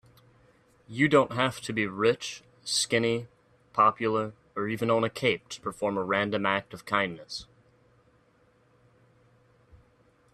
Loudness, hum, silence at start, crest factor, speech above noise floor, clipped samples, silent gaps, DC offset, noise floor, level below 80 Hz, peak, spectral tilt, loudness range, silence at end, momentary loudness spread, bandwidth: -28 LUFS; none; 0.9 s; 22 dB; 37 dB; under 0.1%; none; under 0.1%; -64 dBFS; -66 dBFS; -8 dBFS; -4 dB/octave; 9 LU; 2.9 s; 13 LU; 13.5 kHz